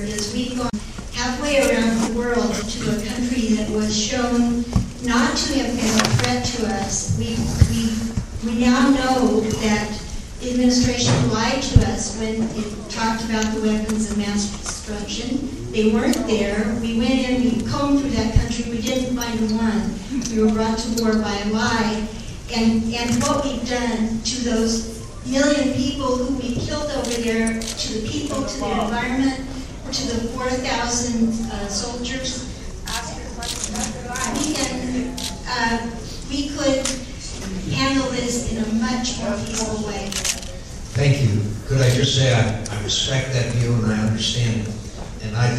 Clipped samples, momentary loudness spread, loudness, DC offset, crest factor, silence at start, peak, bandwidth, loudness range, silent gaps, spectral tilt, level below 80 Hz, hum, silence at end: under 0.1%; 9 LU; -21 LUFS; under 0.1%; 20 dB; 0 s; 0 dBFS; 14.5 kHz; 4 LU; none; -4.5 dB/octave; -34 dBFS; none; 0 s